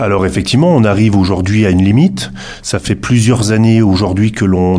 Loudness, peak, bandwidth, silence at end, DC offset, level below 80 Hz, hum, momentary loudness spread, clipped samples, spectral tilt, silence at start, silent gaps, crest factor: -11 LUFS; 0 dBFS; 11 kHz; 0 s; under 0.1%; -34 dBFS; none; 9 LU; under 0.1%; -6.5 dB/octave; 0 s; none; 10 dB